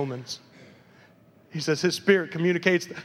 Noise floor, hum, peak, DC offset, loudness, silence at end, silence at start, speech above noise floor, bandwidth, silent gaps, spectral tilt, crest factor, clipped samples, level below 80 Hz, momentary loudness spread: -56 dBFS; none; -6 dBFS; under 0.1%; -24 LUFS; 0 s; 0 s; 31 dB; 14.5 kHz; none; -5 dB/octave; 20 dB; under 0.1%; -76 dBFS; 16 LU